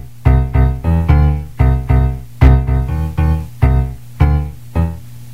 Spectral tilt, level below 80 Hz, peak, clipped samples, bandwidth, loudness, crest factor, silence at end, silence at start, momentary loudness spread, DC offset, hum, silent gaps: -9 dB/octave; -16 dBFS; 0 dBFS; 0.1%; 4.9 kHz; -15 LUFS; 14 dB; 0 s; 0 s; 8 LU; 2%; none; none